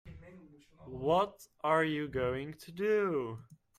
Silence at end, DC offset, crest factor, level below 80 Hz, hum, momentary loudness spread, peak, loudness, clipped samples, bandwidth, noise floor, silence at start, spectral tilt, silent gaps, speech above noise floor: 0.25 s; under 0.1%; 18 dB; -62 dBFS; none; 19 LU; -16 dBFS; -33 LUFS; under 0.1%; 14.5 kHz; -57 dBFS; 0.05 s; -6.5 dB/octave; none; 24 dB